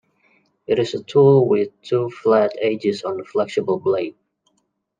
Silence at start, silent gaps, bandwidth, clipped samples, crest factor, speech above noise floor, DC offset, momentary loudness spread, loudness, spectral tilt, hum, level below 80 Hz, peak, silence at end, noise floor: 0.7 s; none; 7.6 kHz; under 0.1%; 16 dB; 51 dB; under 0.1%; 10 LU; -19 LUFS; -7.5 dB/octave; none; -70 dBFS; -4 dBFS; 0.9 s; -70 dBFS